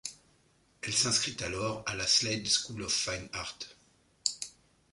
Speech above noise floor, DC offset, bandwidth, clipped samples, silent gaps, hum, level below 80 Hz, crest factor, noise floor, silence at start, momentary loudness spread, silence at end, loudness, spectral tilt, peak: 35 dB; under 0.1%; 11.5 kHz; under 0.1%; none; none; -60 dBFS; 26 dB; -67 dBFS; 0.05 s; 16 LU; 0.45 s; -30 LUFS; -1.5 dB/octave; -8 dBFS